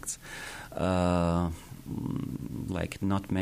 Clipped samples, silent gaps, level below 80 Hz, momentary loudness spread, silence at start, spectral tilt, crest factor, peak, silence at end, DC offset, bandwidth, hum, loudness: under 0.1%; none; -48 dBFS; 13 LU; 0 s; -6 dB/octave; 16 dB; -16 dBFS; 0 s; under 0.1%; 15.5 kHz; none; -32 LUFS